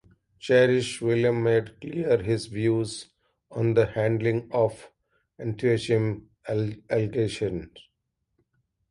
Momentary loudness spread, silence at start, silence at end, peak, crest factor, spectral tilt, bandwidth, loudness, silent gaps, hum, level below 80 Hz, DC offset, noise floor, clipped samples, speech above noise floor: 12 LU; 0.45 s; 1.1 s; -8 dBFS; 18 dB; -6.5 dB/octave; 11.5 kHz; -25 LUFS; none; none; -56 dBFS; under 0.1%; -78 dBFS; under 0.1%; 54 dB